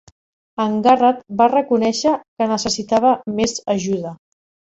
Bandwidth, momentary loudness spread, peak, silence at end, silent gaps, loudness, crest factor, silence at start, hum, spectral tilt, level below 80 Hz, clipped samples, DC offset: 8.2 kHz; 9 LU; -2 dBFS; 0.55 s; 2.28-2.37 s; -18 LUFS; 16 dB; 0.6 s; none; -4.5 dB/octave; -56 dBFS; under 0.1%; under 0.1%